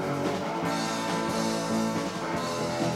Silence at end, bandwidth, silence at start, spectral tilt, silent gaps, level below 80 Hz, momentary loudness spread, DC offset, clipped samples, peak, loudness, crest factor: 0 s; 16 kHz; 0 s; -4.5 dB/octave; none; -58 dBFS; 3 LU; under 0.1%; under 0.1%; -14 dBFS; -29 LUFS; 14 dB